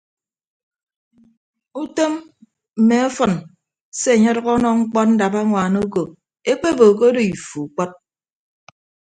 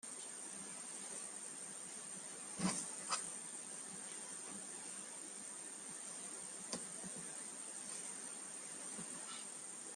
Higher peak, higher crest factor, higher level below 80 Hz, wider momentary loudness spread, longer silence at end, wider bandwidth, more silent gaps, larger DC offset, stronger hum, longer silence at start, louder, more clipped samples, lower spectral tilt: first, 0 dBFS vs -24 dBFS; second, 18 dB vs 24 dB; first, -54 dBFS vs -86 dBFS; first, 15 LU vs 6 LU; first, 1.15 s vs 0 s; second, 9.4 kHz vs 15 kHz; first, 3.81-3.92 s vs none; neither; neither; first, 1.75 s vs 0.05 s; first, -17 LUFS vs -45 LUFS; neither; first, -5.5 dB/octave vs -2 dB/octave